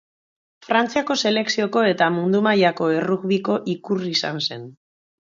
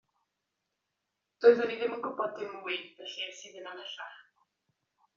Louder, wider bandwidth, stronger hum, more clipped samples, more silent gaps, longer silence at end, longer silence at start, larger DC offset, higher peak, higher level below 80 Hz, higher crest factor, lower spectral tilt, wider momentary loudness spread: first, -20 LUFS vs -31 LUFS; about the same, 7.6 kHz vs 7.4 kHz; neither; neither; neither; second, 0.6 s vs 0.95 s; second, 0.7 s vs 1.4 s; neither; first, -2 dBFS vs -10 dBFS; first, -68 dBFS vs -84 dBFS; second, 18 dB vs 24 dB; first, -5 dB/octave vs -0.5 dB/octave; second, 7 LU vs 20 LU